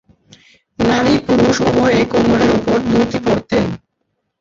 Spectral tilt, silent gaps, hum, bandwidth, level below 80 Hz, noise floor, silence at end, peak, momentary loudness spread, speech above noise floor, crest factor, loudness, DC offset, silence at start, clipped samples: -6 dB/octave; none; none; 7.6 kHz; -38 dBFS; -70 dBFS; 0.65 s; -2 dBFS; 5 LU; 57 dB; 12 dB; -14 LUFS; under 0.1%; 0.8 s; under 0.1%